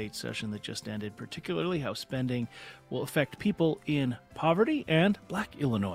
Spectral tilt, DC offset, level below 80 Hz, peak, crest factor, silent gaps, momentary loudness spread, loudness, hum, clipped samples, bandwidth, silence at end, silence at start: -6 dB/octave; under 0.1%; -62 dBFS; -12 dBFS; 20 dB; none; 12 LU; -31 LUFS; none; under 0.1%; 16 kHz; 0 s; 0 s